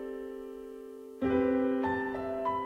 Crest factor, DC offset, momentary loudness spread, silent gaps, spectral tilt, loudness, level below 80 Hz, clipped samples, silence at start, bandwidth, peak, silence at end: 16 dB; under 0.1%; 17 LU; none; -7.5 dB/octave; -32 LUFS; -58 dBFS; under 0.1%; 0 s; 5.4 kHz; -16 dBFS; 0 s